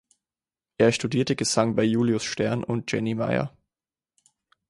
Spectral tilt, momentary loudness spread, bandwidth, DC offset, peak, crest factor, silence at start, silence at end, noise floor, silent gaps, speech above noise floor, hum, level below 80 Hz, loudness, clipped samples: -5 dB/octave; 6 LU; 11.5 kHz; under 0.1%; -6 dBFS; 20 dB; 0.8 s; 1.2 s; under -90 dBFS; none; over 66 dB; none; -58 dBFS; -24 LUFS; under 0.1%